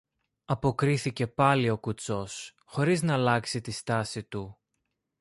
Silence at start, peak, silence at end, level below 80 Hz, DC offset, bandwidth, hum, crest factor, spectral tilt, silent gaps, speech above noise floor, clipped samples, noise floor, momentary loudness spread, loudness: 0.5 s; -10 dBFS; 0.65 s; -58 dBFS; under 0.1%; 11.5 kHz; none; 20 dB; -5.5 dB/octave; none; 53 dB; under 0.1%; -81 dBFS; 14 LU; -28 LUFS